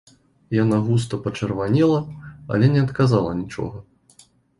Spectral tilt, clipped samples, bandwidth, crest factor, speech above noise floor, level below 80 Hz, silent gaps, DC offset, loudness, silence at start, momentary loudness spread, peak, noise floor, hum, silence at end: -8 dB/octave; under 0.1%; 11.5 kHz; 18 dB; 35 dB; -48 dBFS; none; under 0.1%; -21 LUFS; 0.5 s; 13 LU; -4 dBFS; -54 dBFS; none; 0.8 s